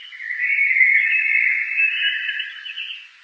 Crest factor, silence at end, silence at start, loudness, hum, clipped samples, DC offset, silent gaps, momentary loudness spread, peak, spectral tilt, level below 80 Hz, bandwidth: 18 dB; 0.15 s; 0 s; -16 LUFS; none; under 0.1%; under 0.1%; none; 15 LU; -4 dBFS; 6.5 dB/octave; under -90 dBFS; 7.2 kHz